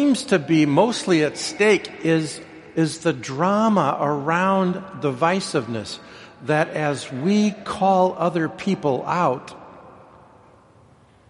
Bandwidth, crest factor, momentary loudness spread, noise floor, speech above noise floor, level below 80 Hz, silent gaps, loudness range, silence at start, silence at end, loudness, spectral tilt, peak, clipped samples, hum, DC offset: 11.5 kHz; 20 dB; 11 LU; -52 dBFS; 32 dB; -62 dBFS; none; 3 LU; 0 s; 1.4 s; -21 LUFS; -5.5 dB/octave; -2 dBFS; under 0.1%; none; under 0.1%